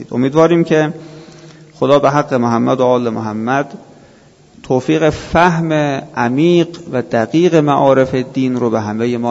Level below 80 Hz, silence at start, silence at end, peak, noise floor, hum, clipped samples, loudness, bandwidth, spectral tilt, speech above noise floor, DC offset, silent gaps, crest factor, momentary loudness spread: -44 dBFS; 0 s; 0 s; 0 dBFS; -45 dBFS; none; under 0.1%; -14 LUFS; 8 kHz; -7 dB/octave; 32 dB; under 0.1%; none; 14 dB; 8 LU